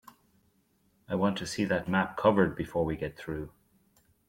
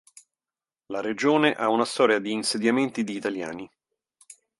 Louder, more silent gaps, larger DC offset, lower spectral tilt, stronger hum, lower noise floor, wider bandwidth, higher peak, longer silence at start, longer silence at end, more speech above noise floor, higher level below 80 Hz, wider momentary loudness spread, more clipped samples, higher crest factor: second, -30 LUFS vs -24 LUFS; neither; neither; first, -6 dB/octave vs -4 dB/octave; neither; second, -70 dBFS vs under -90 dBFS; first, 16 kHz vs 11.5 kHz; second, -12 dBFS vs -4 dBFS; first, 1.1 s vs 0.9 s; first, 0.8 s vs 0.25 s; second, 41 dB vs over 66 dB; first, -56 dBFS vs -72 dBFS; about the same, 13 LU vs 14 LU; neither; about the same, 20 dB vs 22 dB